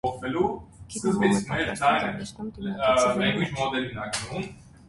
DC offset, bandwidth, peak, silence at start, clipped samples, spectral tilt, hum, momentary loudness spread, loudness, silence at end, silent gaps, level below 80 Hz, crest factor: under 0.1%; 11.5 kHz; -10 dBFS; 0.05 s; under 0.1%; -4.5 dB/octave; none; 13 LU; -26 LUFS; 0 s; none; -50 dBFS; 18 dB